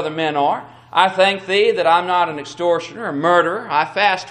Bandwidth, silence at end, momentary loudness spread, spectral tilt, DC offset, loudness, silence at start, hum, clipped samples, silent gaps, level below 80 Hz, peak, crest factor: 10 kHz; 0 s; 7 LU; -4 dB/octave; under 0.1%; -17 LUFS; 0 s; none; under 0.1%; none; -64 dBFS; 0 dBFS; 18 dB